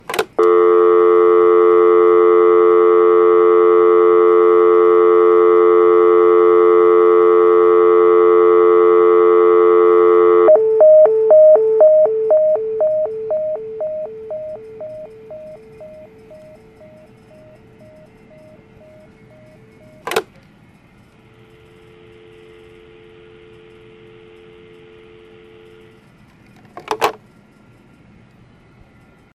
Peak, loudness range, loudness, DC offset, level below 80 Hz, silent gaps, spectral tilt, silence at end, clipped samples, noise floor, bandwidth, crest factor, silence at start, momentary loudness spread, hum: 0 dBFS; 21 LU; -11 LUFS; under 0.1%; -58 dBFS; none; -6 dB/octave; 2.2 s; under 0.1%; -48 dBFS; 12 kHz; 14 dB; 0.1 s; 14 LU; none